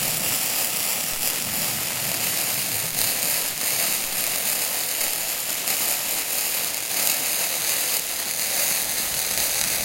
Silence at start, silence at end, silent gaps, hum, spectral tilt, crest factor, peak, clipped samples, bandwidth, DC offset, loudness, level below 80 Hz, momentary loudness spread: 0 s; 0 s; none; none; 0 dB/octave; 24 dB; 0 dBFS; under 0.1%; 16.5 kHz; under 0.1%; -21 LUFS; -56 dBFS; 3 LU